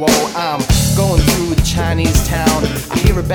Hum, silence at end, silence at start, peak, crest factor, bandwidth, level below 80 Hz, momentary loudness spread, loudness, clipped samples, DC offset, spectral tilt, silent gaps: none; 0 s; 0 s; 0 dBFS; 14 dB; over 20 kHz; -20 dBFS; 5 LU; -14 LUFS; under 0.1%; under 0.1%; -4.5 dB/octave; none